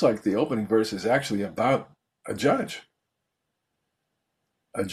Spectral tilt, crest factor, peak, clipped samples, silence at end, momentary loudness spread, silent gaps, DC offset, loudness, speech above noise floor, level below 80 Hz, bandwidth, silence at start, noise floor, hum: -5.5 dB/octave; 18 dB; -8 dBFS; under 0.1%; 0 s; 12 LU; none; under 0.1%; -26 LUFS; 56 dB; -64 dBFS; 14 kHz; 0 s; -81 dBFS; none